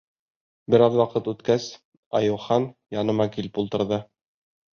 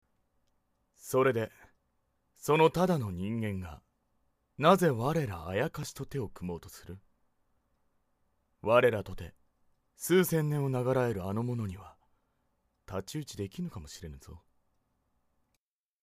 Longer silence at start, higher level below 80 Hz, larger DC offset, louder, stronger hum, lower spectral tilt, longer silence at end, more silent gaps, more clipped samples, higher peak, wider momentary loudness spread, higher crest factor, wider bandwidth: second, 0.7 s vs 1.05 s; about the same, -60 dBFS vs -58 dBFS; neither; first, -24 LUFS vs -31 LUFS; neither; about the same, -7 dB/octave vs -6 dB/octave; second, 0.75 s vs 1.65 s; first, 1.85-2.11 s vs none; neither; first, -4 dBFS vs -8 dBFS; second, 10 LU vs 21 LU; about the same, 20 dB vs 24 dB; second, 7 kHz vs 15.5 kHz